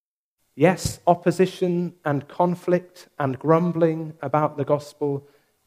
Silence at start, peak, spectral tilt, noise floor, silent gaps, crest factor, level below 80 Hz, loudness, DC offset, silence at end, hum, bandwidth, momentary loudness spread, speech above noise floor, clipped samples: 0.55 s; -2 dBFS; -7 dB/octave; -75 dBFS; none; 20 dB; -54 dBFS; -23 LUFS; under 0.1%; 0.45 s; none; 15.5 kHz; 8 LU; 53 dB; under 0.1%